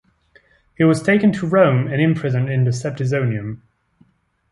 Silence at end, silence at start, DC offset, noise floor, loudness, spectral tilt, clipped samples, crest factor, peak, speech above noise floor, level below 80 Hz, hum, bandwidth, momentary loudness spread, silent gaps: 0.95 s; 0.8 s; under 0.1%; -58 dBFS; -18 LUFS; -7.5 dB/octave; under 0.1%; 16 dB; -2 dBFS; 41 dB; -54 dBFS; none; 11.5 kHz; 8 LU; none